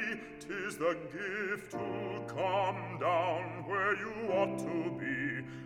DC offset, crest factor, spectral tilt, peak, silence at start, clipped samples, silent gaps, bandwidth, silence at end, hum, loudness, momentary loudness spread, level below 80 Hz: under 0.1%; 16 dB; -5.5 dB/octave; -18 dBFS; 0 s; under 0.1%; none; 16.5 kHz; 0 s; none; -35 LUFS; 7 LU; -68 dBFS